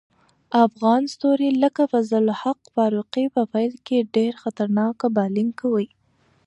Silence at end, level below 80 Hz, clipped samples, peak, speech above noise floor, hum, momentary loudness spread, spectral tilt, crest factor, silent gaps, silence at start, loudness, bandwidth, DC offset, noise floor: 0.6 s; -72 dBFS; under 0.1%; -4 dBFS; 41 dB; none; 6 LU; -7 dB/octave; 18 dB; none; 0.5 s; -21 LUFS; 8.4 kHz; under 0.1%; -62 dBFS